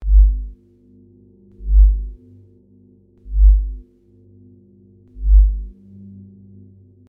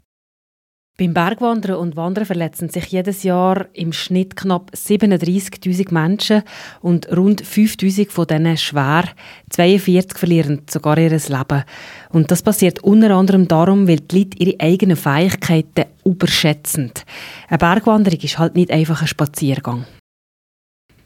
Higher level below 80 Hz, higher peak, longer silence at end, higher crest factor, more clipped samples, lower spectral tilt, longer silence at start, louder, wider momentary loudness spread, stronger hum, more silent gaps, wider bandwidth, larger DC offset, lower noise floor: first, -18 dBFS vs -50 dBFS; about the same, -2 dBFS vs 0 dBFS; first, 1.4 s vs 1.2 s; about the same, 14 dB vs 16 dB; neither; first, -13 dB/octave vs -6 dB/octave; second, 0 s vs 1 s; about the same, -18 LUFS vs -16 LUFS; first, 24 LU vs 9 LU; first, 50 Hz at -25 dBFS vs none; neither; second, 0.5 kHz vs 17 kHz; neither; second, -51 dBFS vs under -90 dBFS